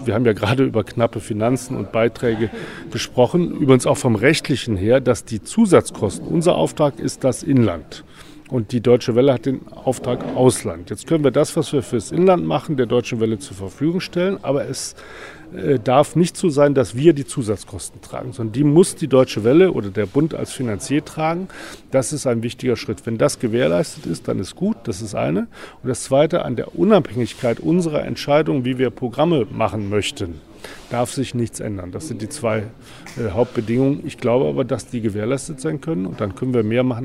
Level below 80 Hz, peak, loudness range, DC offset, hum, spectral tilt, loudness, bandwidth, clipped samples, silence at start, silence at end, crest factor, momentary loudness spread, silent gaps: -48 dBFS; 0 dBFS; 4 LU; under 0.1%; none; -6 dB/octave; -19 LUFS; 15 kHz; under 0.1%; 0 s; 0 s; 18 dB; 12 LU; none